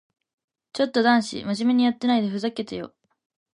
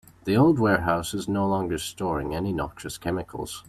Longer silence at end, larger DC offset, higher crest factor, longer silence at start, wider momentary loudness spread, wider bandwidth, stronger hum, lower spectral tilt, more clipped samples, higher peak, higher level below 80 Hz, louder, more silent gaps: first, 0.65 s vs 0.05 s; neither; about the same, 18 dB vs 18 dB; first, 0.75 s vs 0.25 s; first, 15 LU vs 11 LU; second, 11 kHz vs 14.5 kHz; neither; about the same, -5 dB/octave vs -6 dB/octave; neither; about the same, -6 dBFS vs -8 dBFS; second, -66 dBFS vs -48 dBFS; about the same, -23 LUFS vs -25 LUFS; neither